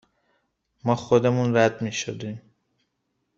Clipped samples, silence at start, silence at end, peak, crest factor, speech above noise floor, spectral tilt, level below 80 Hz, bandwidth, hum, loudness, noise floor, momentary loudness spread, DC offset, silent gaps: under 0.1%; 0.85 s; 1 s; -4 dBFS; 22 dB; 53 dB; -6 dB/octave; -62 dBFS; 7.8 kHz; none; -23 LUFS; -76 dBFS; 15 LU; under 0.1%; none